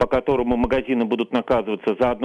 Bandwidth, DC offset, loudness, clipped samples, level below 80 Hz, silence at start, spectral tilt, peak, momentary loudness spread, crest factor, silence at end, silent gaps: 7 kHz; under 0.1%; -21 LUFS; under 0.1%; -40 dBFS; 0 s; -7.5 dB/octave; -8 dBFS; 2 LU; 12 dB; 0 s; none